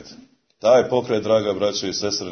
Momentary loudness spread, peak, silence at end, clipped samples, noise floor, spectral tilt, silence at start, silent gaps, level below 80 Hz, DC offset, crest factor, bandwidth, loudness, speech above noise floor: 7 LU; -4 dBFS; 0 s; under 0.1%; -48 dBFS; -4 dB/octave; 0 s; none; -60 dBFS; under 0.1%; 16 dB; 6.6 kHz; -20 LUFS; 28 dB